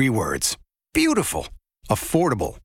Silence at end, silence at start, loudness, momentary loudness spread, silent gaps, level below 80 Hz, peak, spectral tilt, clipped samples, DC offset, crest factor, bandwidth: 0.05 s; 0 s; -22 LUFS; 10 LU; none; -42 dBFS; -4 dBFS; -4.5 dB/octave; under 0.1%; under 0.1%; 18 dB; 17 kHz